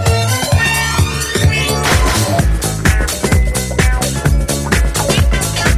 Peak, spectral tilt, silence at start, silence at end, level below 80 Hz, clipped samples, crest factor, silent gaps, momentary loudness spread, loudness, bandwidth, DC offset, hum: 0 dBFS; -4 dB/octave; 0 s; 0 s; -18 dBFS; under 0.1%; 12 dB; none; 3 LU; -14 LUFS; 16 kHz; under 0.1%; none